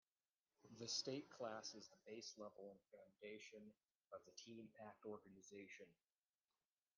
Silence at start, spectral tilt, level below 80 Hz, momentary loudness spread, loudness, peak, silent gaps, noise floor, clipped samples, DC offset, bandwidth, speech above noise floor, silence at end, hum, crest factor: 0.65 s; -2.5 dB/octave; under -90 dBFS; 17 LU; -55 LUFS; -32 dBFS; 3.97-4.01 s; under -90 dBFS; under 0.1%; under 0.1%; 10 kHz; over 34 dB; 1.05 s; none; 24 dB